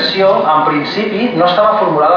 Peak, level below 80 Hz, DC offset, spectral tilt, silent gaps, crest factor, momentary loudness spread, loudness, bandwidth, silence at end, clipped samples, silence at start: 0 dBFS; -54 dBFS; under 0.1%; -6.5 dB/octave; none; 10 dB; 5 LU; -12 LUFS; 5.4 kHz; 0 s; under 0.1%; 0 s